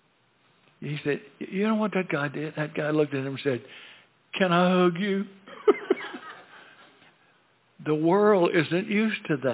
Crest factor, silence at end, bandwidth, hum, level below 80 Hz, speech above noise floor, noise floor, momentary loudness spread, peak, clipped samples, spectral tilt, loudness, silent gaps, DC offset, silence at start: 20 dB; 0 s; 4 kHz; none; -78 dBFS; 40 dB; -65 dBFS; 17 LU; -8 dBFS; under 0.1%; -10.5 dB/octave; -26 LUFS; none; under 0.1%; 0.8 s